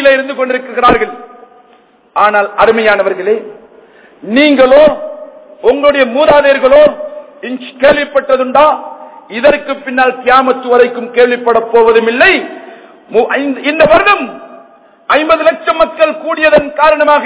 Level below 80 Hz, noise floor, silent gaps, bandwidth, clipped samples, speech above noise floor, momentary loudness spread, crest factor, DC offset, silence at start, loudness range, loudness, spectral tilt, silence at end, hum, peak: -42 dBFS; -45 dBFS; none; 4 kHz; 4%; 37 dB; 16 LU; 10 dB; under 0.1%; 0 s; 3 LU; -9 LUFS; -7.5 dB/octave; 0 s; none; 0 dBFS